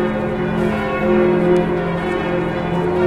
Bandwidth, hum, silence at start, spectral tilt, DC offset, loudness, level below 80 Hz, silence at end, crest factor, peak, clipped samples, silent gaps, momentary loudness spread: 10 kHz; none; 0 s; -8 dB/octave; under 0.1%; -18 LUFS; -38 dBFS; 0 s; 14 dB; -4 dBFS; under 0.1%; none; 5 LU